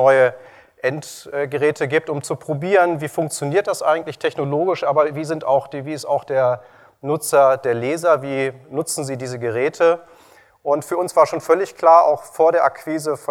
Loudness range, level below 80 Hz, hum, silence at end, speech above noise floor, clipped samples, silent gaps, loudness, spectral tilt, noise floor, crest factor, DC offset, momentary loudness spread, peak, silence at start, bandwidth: 4 LU; -68 dBFS; none; 0.05 s; 32 dB; under 0.1%; none; -19 LUFS; -5 dB/octave; -50 dBFS; 18 dB; under 0.1%; 11 LU; 0 dBFS; 0 s; 17.5 kHz